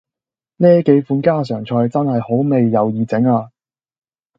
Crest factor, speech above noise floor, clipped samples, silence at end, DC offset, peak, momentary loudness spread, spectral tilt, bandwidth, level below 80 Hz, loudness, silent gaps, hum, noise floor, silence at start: 16 dB; 74 dB; under 0.1%; 0.9 s; under 0.1%; 0 dBFS; 6 LU; -10 dB/octave; 7.4 kHz; -60 dBFS; -15 LUFS; none; none; -88 dBFS; 0.6 s